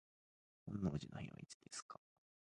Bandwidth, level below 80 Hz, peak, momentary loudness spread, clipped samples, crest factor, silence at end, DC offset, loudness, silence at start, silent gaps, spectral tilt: 11 kHz; -66 dBFS; -28 dBFS; 16 LU; under 0.1%; 22 dB; 0.5 s; under 0.1%; -48 LUFS; 0.65 s; 1.54-1.60 s, 1.82-1.89 s; -5.5 dB/octave